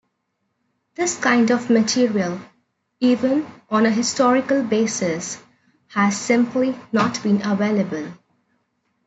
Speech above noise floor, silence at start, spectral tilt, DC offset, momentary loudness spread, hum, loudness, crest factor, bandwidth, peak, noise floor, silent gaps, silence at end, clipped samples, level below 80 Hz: 54 dB; 1 s; -4.5 dB/octave; under 0.1%; 10 LU; none; -20 LUFS; 18 dB; 8.2 kHz; -4 dBFS; -73 dBFS; none; 0.9 s; under 0.1%; -68 dBFS